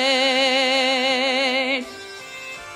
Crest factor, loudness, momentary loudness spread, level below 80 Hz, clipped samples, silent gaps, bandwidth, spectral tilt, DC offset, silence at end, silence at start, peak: 14 dB; -18 LUFS; 17 LU; -64 dBFS; under 0.1%; none; 15.5 kHz; -1 dB/octave; under 0.1%; 0 s; 0 s; -8 dBFS